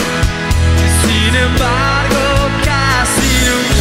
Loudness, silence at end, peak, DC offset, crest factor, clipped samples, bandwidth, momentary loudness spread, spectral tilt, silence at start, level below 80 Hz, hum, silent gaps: -12 LUFS; 0 s; 0 dBFS; under 0.1%; 12 dB; under 0.1%; 16.5 kHz; 3 LU; -4 dB/octave; 0 s; -18 dBFS; none; none